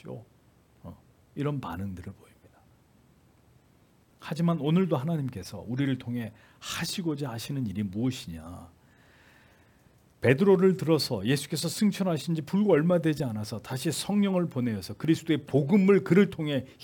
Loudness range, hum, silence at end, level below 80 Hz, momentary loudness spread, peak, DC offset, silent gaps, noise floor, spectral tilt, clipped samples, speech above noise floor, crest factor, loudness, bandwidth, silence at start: 13 LU; none; 0 s; -64 dBFS; 19 LU; -6 dBFS; under 0.1%; none; -62 dBFS; -6.5 dB/octave; under 0.1%; 35 dB; 22 dB; -27 LUFS; 18 kHz; 0.05 s